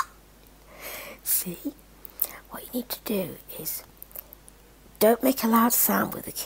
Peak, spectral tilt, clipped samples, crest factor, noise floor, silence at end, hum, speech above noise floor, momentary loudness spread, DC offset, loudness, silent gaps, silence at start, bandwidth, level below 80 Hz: 0 dBFS; -3.5 dB/octave; under 0.1%; 28 dB; -53 dBFS; 0 s; none; 27 dB; 20 LU; under 0.1%; -25 LUFS; none; 0 s; 16.5 kHz; -56 dBFS